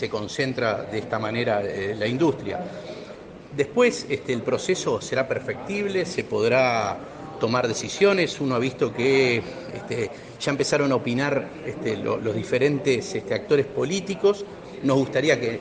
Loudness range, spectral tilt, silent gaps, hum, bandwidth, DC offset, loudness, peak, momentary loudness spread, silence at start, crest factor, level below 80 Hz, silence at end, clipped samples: 3 LU; -5 dB/octave; none; none; 9.8 kHz; under 0.1%; -24 LUFS; -6 dBFS; 11 LU; 0 s; 18 dB; -58 dBFS; 0 s; under 0.1%